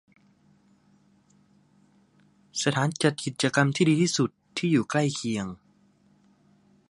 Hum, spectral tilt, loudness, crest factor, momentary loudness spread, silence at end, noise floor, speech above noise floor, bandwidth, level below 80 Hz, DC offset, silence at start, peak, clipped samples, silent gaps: 50 Hz at -50 dBFS; -5 dB/octave; -26 LUFS; 22 dB; 10 LU; 1.35 s; -62 dBFS; 38 dB; 11.5 kHz; -66 dBFS; under 0.1%; 2.55 s; -6 dBFS; under 0.1%; none